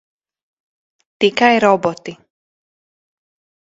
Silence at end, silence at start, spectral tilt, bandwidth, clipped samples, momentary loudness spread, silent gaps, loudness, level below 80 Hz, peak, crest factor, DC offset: 1.55 s; 1.2 s; -4.5 dB/octave; 7.8 kHz; under 0.1%; 19 LU; none; -14 LUFS; -64 dBFS; 0 dBFS; 20 dB; under 0.1%